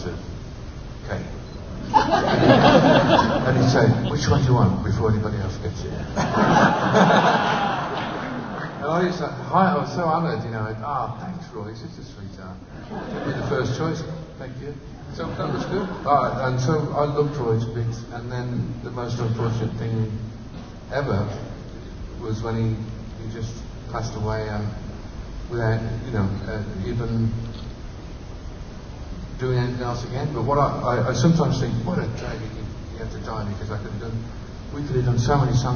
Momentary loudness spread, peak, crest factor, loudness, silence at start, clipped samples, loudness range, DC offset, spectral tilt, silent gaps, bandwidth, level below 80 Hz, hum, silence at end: 19 LU; 0 dBFS; 22 dB; -23 LUFS; 0 s; under 0.1%; 11 LU; under 0.1%; -6.5 dB/octave; none; 6.8 kHz; -38 dBFS; none; 0 s